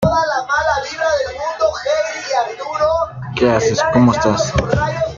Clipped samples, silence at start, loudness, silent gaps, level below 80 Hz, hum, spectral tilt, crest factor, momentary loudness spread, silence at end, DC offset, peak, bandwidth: under 0.1%; 0 s; -17 LUFS; none; -36 dBFS; none; -5 dB/octave; 14 dB; 6 LU; 0 s; under 0.1%; -2 dBFS; 7.6 kHz